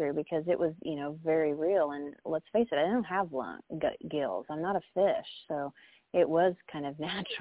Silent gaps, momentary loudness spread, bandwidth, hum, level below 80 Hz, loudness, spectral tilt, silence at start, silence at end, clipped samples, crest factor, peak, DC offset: none; 9 LU; 4 kHz; none; -68 dBFS; -32 LUFS; -4.5 dB/octave; 0 s; 0 s; under 0.1%; 16 dB; -14 dBFS; under 0.1%